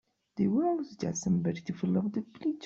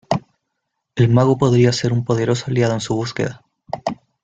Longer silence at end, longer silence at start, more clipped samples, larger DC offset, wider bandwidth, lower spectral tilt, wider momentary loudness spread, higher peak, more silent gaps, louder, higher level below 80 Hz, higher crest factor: second, 0 s vs 0.3 s; first, 0.35 s vs 0.1 s; neither; neither; about the same, 7.8 kHz vs 7.8 kHz; about the same, -7 dB/octave vs -6.5 dB/octave; second, 7 LU vs 12 LU; second, -18 dBFS vs -2 dBFS; neither; second, -31 LUFS vs -18 LUFS; second, -66 dBFS vs -50 dBFS; about the same, 14 dB vs 16 dB